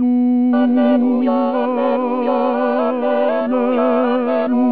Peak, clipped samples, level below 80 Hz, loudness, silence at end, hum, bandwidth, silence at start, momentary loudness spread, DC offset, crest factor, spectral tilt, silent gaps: -4 dBFS; under 0.1%; -68 dBFS; -16 LUFS; 0 s; none; 4.7 kHz; 0 s; 3 LU; 0.8%; 10 dB; -9 dB/octave; none